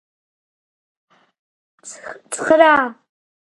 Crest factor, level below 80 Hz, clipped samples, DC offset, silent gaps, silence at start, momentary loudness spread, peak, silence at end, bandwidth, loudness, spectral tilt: 20 dB; -64 dBFS; under 0.1%; under 0.1%; none; 1.85 s; 23 LU; 0 dBFS; 0.5 s; 11.5 kHz; -15 LUFS; -2.5 dB/octave